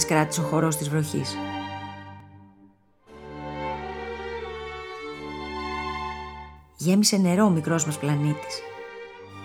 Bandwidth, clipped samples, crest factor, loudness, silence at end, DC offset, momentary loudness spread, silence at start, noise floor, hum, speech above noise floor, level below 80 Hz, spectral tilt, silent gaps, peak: 17.5 kHz; under 0.1%; 22 dB; -26 LUFS; 0 s; under 0.1%; 20 LU; 0 s; -57 dBFS; none; 34 dB; -50 dBFS; -5 dB/octave; none; -6 dBFS